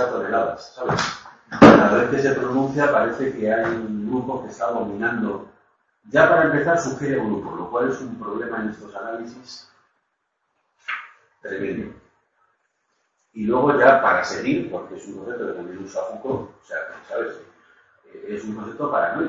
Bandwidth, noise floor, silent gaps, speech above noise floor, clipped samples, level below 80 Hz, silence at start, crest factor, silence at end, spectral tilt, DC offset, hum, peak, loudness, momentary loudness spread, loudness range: 7.8 kHz; -74 dBFS; none; 52 dB; under 0.1%; -54 dBFS; 0 s; 22 dB; 0 s; -6 dB/octave; under 0.1%; none; 0 dBFS; -21 LUFS; 19 LU; 16 LU